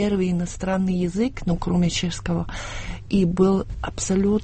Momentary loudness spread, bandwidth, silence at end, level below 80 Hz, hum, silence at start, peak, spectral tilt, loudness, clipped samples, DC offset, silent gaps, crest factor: 11 LU; 8.8 kHz; 0 s; -36 dBFS; none; 0 s; -6 dBFS; -6 dB/octave; -23 LUFS; under 0.1%; under 0.1%; none; 16 dB